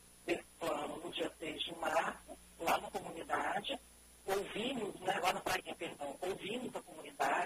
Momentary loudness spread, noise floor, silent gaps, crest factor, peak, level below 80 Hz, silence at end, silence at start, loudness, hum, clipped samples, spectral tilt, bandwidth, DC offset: 10 LU; -60 dBFS; none; 18 dB; -20 dBFS; -68 dBFS; 0 s; 0 s; -39 LUFS; none; under 0.1%; -3 dB/octave; 15 kHz; under 0.1%